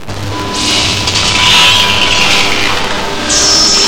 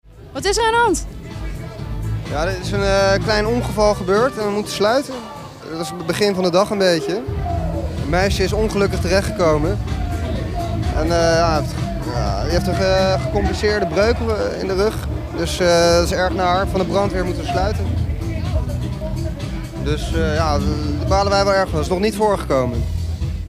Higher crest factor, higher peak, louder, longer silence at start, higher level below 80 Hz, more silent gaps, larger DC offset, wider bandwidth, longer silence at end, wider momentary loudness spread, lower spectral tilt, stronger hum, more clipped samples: second, 10 dB vs 16 dB; about the same, 0 dBFS vs -2 dBFS; first, -8 LUFS vs -19 LUFS; second, 0 s vs 0.15 s; about the same, -30 dBFS vs -28 dBFS; neither; neither; first, over 20 kHz vs 16 kHz; about the same, 0 s vs 0 s; about the same, 10 LU vs 10 LU; second, -1.5 dB/octave vs -5.5 dB/octave; neither; first, 0.4% vs under 0.1%